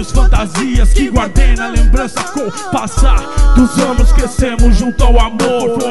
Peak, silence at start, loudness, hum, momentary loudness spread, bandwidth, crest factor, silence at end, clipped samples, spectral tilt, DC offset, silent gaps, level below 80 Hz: 0 dBFS; 0 s; -13 LUFS; none; 6 LU; 12 kHz; 10 dB; 0 s; 0.2%; -5.5 dB/octave; 4%; none; -10 dBFS